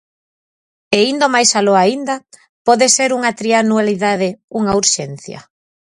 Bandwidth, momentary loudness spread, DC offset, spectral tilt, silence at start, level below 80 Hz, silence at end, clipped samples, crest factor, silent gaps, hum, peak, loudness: 15 kHz; 11 LU; under 0.1%; -2.5 dB/octave; 0.9 s; -54 dBFS; 0.45 s; under 0.1%; 16 dB; 2.49-2.65 s, 4.44-4.48 s; none; 0 dBFS; -14 LUFS